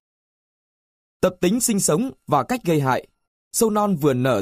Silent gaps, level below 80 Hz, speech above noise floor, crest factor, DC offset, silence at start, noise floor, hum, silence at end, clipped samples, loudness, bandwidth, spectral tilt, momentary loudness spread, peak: 3.27-3.51 s; -54 dBFS; over 70 dB; 18 dB; under 0.1%; 1.2 s; under -90 dBFS; none; 0 s; under 0.1%; -21 LUFS; 15.5 kHz; -5 dB/octave; 5 LU; -4 dBFS